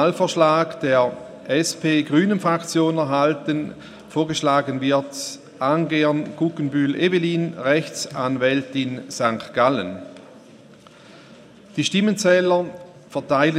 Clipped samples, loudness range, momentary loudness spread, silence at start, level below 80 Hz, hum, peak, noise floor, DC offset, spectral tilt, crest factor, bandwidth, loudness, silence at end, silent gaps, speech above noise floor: under 0.1%; 4 LU; 13 LU; 0 s; -66 dBFS; none; -2 dBFS; -47 dBFS; under 0.1%; -5 dB/octave; 20 dB; 14.5 kHz; -21 LUFS; 0 s; none; 26 dB